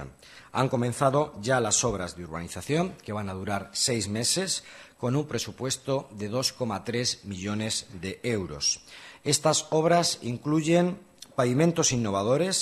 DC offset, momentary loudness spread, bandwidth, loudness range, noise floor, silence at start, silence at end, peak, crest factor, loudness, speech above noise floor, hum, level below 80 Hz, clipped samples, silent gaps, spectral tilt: under 0.1%; 11 LU; 13 kHz; 5 LU; -48 dBFS; 0 s; 0 s; -8 dBFS; 18 dB; -27 LUFS; 20 dB; none; -58 dBFS; under 0.1%; none; -4 dB/octave